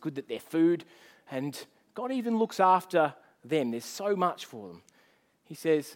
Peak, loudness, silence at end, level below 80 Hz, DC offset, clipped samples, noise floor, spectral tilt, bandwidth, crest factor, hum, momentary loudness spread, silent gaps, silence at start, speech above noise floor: -10 dBFS; -29 LUFS; 0 s; -84 dBFS; under 0.1%; under 0.1%; -66 dBFS; -5.5 dB/octave; 17 kHz; 20 dB; none; 19 LU; none; 0 s; 37 dB